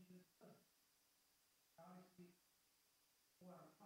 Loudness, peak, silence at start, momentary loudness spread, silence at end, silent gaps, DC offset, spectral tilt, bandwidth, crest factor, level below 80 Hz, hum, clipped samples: -67 LUFS; -52 dBFS; 0 s; 5 LU; 0 s; none; under 0.1%; -5.5 dB/octave; 16 kHz; 18 dB; under -90 dBFS; none; under 0.1%